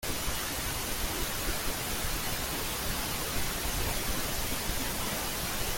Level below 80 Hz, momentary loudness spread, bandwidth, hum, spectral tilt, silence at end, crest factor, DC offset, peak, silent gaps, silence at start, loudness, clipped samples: -40 dBFS; 1 LU; 17 kHz; none; -2.5 dB/octave; 0 s; 14 dB; under 0.1%; -18 dBFS; none; 0 s; -32 LUFS; under 0.1%